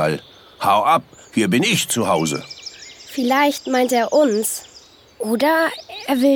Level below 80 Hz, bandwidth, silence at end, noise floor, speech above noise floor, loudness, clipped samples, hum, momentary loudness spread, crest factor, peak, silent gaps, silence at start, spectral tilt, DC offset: -60 dBFS; 19 kHz; 0 s; -47 dBFS; 29 dB; -18 LUFS; under 0.1%; none; 13 LU; 16 dB; -4 dBFS; none; 0 s; -4 dB/octave; under 0.1%